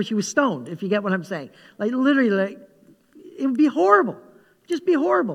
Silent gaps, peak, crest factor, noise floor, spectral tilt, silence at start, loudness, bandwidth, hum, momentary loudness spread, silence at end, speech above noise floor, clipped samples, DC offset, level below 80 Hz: none; -2 dBFS; 20 dB; -52 dBFS; -5.5 dB/octave; 0 s; -21 LUFS; 12.5 kHz; none; 13 LU; 0 s; 32 dB; under 0.1%; under 0.1%; -76 dBFS